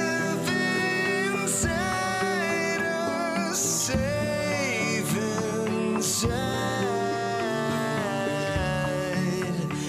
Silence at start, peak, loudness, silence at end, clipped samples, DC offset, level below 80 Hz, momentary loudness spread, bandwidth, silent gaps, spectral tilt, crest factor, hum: 0 s; -12 dBFS; -26 LUFS; 0 s; under 0.1%; under 0.1%; -46 dBFS; 3 LU; 15.5 kHz; none; -4 dB/octave; 14 dB; none